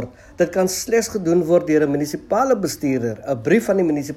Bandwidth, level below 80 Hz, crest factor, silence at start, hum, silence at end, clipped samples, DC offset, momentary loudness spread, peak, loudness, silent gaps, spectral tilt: 16 kHz; -52 dBFS; 14 dB; 0 s; none; 0 s; under 0.1%; under 0.1%; 7 LU; -4 dBFS; -19 LUFS; none; -5.5 dB/octave